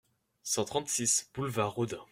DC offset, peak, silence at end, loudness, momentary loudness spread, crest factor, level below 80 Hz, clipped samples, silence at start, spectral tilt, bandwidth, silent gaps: under 0.1%; -16 dBFS; 0.1 s; -31 LUFS; 8 LU; 18 dB; -66 dBFS; under 0.1%; 0.45 s; -3 dB/octave; 16 kHz; none